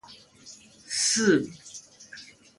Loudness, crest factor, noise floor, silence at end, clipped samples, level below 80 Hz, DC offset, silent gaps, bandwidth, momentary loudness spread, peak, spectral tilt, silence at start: -24 LUFS; 20 dB; -51 dBFS; 0.35 s; under 0.1%; -70 dBFS; under 0.1%; none; 11.5 kHz; 25 LU; -10 dBFS; -2.5 dB/octave; 0.1 s